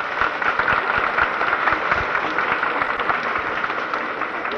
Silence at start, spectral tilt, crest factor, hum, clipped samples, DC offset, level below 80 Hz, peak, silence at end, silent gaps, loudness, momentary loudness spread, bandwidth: 0 s; -4.5 dB/octave; 16 dB; none; under 0.1%; under 0.1%; -48 dBFS; -6 dBFS; 0 s; none; -20 LUFS; 5 LU; 9.6 kHz